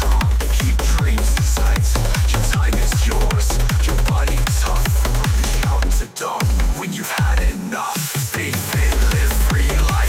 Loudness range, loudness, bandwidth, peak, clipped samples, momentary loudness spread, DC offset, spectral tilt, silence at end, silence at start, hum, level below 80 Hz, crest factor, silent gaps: 2 LU; -19 LUFS; 16.5 kHz; -6 dBFS; under 0.1%; 4 LU; under 0.1%; -4.5 dB/octave; 0 s; 0 s; none; -18 dBFS; 10 dB; none